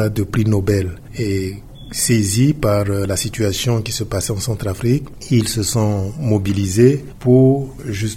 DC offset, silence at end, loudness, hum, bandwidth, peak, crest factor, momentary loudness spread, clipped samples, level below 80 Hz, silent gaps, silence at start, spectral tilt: under 0.1%; 0 s; -18 LUFS; none; 16.5 kHz; 0 dBFS; 16 dB; 9 LU; under 0.1%; -38 dBFS; none; 0 s; -5.5 dB/octave